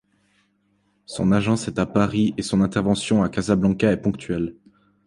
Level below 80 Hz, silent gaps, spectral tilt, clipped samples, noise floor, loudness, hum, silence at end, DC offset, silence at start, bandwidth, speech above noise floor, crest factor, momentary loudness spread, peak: -46 dBFS; none; -6.5 dB/octave; under 0.1%; -66 dBFS; -21 LUFS; none; 0.55 s; under 0.1%; 1.1 s; 11.5 kHz; 45 dB; 18 dB; 7 LU; -4 dBFS